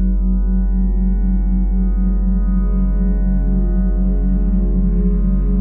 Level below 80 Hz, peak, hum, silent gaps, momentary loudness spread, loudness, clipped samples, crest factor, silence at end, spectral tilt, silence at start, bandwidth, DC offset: -16 dBFS; -6 dBFS; none; none; 1 LU; -18 LUFS; under 0.1%; 8 dB; 0 s; -13.5 dB/octave; 0 s; 2 kHz; under 0.1%